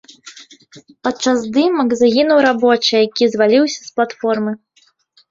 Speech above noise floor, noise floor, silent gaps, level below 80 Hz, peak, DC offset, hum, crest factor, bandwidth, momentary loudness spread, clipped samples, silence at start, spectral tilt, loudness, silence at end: 42 dB; -57 dBFS; none; -60 dBFS; -2 dBFS; under 0.1%; none; 14 dB; 7.8 kHz; 9 LU; under 0.1%; 0.25 s; -4 dB/octave; -15 LUFS; 0.75 s